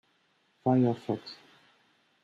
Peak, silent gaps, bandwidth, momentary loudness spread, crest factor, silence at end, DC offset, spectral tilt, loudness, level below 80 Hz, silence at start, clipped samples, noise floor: -14 dBFS; none; 7.4 kHz; 21 LU; 18 dB; 0.9 s; under 0.1%; -9 dB/octave; -29 LUFS; -76 dBFS; 0.65 s; under 0.1%; -71 dBFS